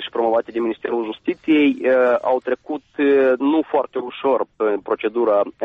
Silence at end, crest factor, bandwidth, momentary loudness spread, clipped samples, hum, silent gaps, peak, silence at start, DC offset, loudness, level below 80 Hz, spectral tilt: 0 s; 12 dB; 5 kHz; 9 LU; under 0.1%; none; none; -6 dBFS; 0 s; under 0.1%; -19 LUFS; -64 dBFS; -7 dB/octave